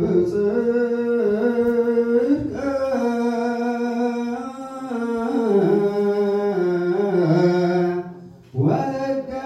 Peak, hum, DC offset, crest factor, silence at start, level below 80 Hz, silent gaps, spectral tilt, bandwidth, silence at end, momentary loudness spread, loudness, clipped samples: -6 dBFS; none; under 0.1%; 14 dB; 0 s; -54 dBFS; none; -8.5 dB/octave; 12 kHz; 0 s; 8 LU; -21 LUFS; under 0.1%